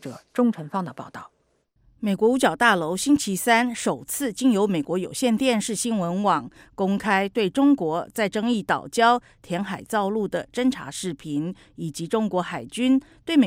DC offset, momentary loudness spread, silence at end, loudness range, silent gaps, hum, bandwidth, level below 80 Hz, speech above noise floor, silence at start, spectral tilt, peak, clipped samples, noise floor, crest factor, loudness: under 0.1%; 11 LU; 0 s; 5 LU; none; none; 16 kHz; -60 dBFS; 43 dB; 0.05 s; -4.5 dB/octave; -4 dBFS; under 0.1%; -66 dBFS; 18 dB; -23 LUFS